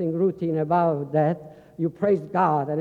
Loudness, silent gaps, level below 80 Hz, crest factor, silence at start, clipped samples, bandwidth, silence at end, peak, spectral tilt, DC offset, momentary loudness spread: -24 LUFS; none; -64 dBFS; 14 dB; 0 s; under 0.1%; 4.9 kHz; 0 s; -8 dBFS; -10.5 dB/octave; under 0.1%; 8 LU